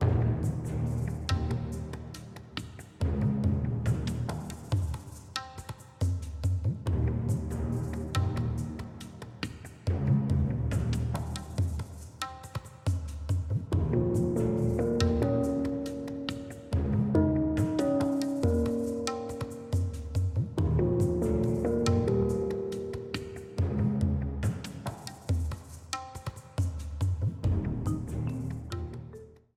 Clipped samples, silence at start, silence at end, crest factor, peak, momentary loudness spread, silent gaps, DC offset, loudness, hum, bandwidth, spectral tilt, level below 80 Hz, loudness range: under 0.1%; 0 s; 0.25 s; 20 dB; -10 dBFS; 12 LU; none; under 0.1%; -31 LUFS; none; 14 kHz; -7.5 dB/octave; -40 dBFS; 5 LU